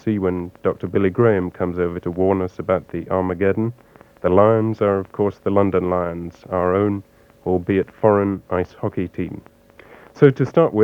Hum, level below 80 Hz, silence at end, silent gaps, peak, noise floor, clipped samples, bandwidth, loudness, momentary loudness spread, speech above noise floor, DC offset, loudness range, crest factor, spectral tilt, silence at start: none; -50 dBFS; 0 s; none; 0 dBFS; -46 dBFS; under 0.1%; 6.8 kHz; -20 LUFS; 10 LU; 27 dB; under 0.1%; 2 LU; 20 dB; -9.5 dB/octave; 0.05 s